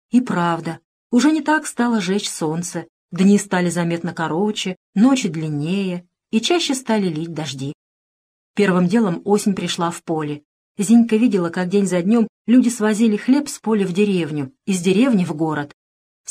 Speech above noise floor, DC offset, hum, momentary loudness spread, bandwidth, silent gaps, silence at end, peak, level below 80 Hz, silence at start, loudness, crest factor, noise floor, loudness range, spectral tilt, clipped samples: over 72 dB; under 0.1%; none; 11 LU; 14.5 kHz; 0.84-1.10 s, 2.89-3.09 s, 4.77-4.93 s, 7.74-8.54 s, 10.45-10.75 s, 12.29-12.45 s; 0.65 s; -4 dBFS; -66 dBFS; 0.15 s; -19 LUFS; 14 dB; under -90 dBFS; 4 LU; -5.5 dB/octave; under 0.1%